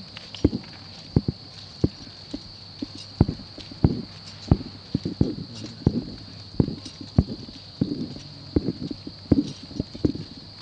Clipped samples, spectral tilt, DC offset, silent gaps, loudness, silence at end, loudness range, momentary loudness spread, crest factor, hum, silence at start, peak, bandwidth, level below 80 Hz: under 0.1%; -7.5 dB/octave; under 0.1%; none; -28 LUFS; 0 s; 2 LU; 14 LU; 26 dB; none; 0 s; -2 dBFS; 9.2 kHz; -38 dBFS